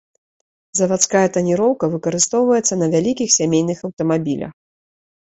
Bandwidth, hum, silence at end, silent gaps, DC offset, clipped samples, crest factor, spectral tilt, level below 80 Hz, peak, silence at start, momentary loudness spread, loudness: 8.4 kHz; none; 0.7 s; 3.93-3.97 s; under 0.1%; under 0.1%; 18 dB; -4 dB/octave; -58 dBFS; 0 dBFS; 0.75 s; 9 LU; -17 LUFS